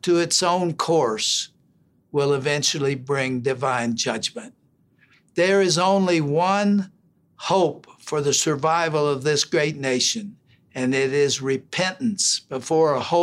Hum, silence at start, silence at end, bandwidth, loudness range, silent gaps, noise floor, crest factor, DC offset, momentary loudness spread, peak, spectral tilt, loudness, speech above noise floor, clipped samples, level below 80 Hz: none; 0.05 s; 0 s; 15 kHz; 2 LU; none; -61 dBFS; 16 dB; under 0.1%; 9 LU; -6 dBFS; -3.5 dB/octave; -21 LUFS; 40 dB; under 0.1%; -68 dBFS